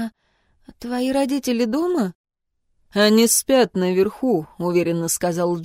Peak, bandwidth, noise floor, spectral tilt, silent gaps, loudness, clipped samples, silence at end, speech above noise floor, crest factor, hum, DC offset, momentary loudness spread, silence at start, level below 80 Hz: -4 dBFS; 16 kHz; -69 dBFS; -4 dB/octave; 2.15-2.24 s; -20 LUFS; under 0.1%; 0 s; 49 dB; 18 dB; none; under 0.1%; 11 LU; 0 s; -56 dBFS